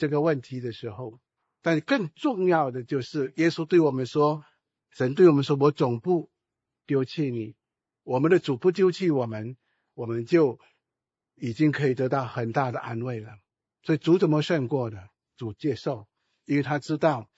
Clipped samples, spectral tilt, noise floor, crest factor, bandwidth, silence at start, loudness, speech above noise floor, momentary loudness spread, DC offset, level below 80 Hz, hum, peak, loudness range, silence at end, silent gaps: under 0.1%; -7.5 dB/octave; -88 dBFS; 20 dB; 8 kHz; 0 s; -25 LUFS; 64 dB; 15 LU; under 0.1%; -70 dBFS; none; -6 dBFS; 4 LU; 0.15 s; none